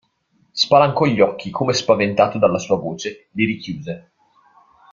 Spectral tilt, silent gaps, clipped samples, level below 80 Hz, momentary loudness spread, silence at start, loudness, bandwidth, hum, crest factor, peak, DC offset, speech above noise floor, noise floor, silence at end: -5 dB/octave; none; under 0.1%; -56 dBFS; 15 LU; 0.55 s; -18 LUFS; 7.4 kHz; none; 18 dB; 0 dBFS; under 0.1%; 45 dB; -62 dBFS; 0.9 s